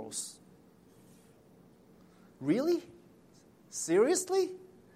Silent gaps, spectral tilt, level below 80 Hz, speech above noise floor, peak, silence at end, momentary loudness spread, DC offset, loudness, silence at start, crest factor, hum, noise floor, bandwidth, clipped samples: none; -4 dB/octave; -76 dBFS; 31 dB; -16 dBFS; 0.3 s; 16 LU; under 0.1%; -32 LUFS; 0 s; 18 dB; none; -61 dBFS; 16 kHz; under 0.1%